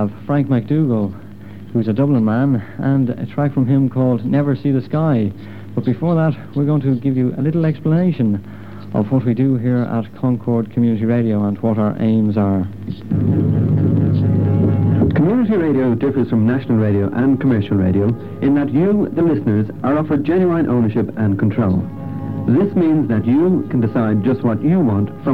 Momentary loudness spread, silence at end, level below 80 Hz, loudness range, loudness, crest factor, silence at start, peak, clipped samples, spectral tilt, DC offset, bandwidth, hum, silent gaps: 6 LU; 0 s; -46 dBFS; 2 LU; -17 LUFS; 12 dB; 0 s; -4 dBFS; under 0.1%; -11 dB/octave; 1%; 4.8 kHz; none; none